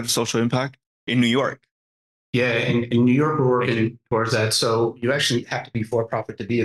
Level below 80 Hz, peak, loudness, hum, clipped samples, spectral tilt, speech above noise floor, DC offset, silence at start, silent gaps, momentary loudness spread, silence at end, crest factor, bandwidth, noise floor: -60 dBFS; -10 dBFS; -21 LUFS; none; under 0.1%; -5 dB/octave; over 69 dB; under 0.1%; 0 s; 0.86-1.07 s, 1.71-2.33 s; 8 LU; 0 s; 12 dB; 12.5 kHz; under -90 dBFS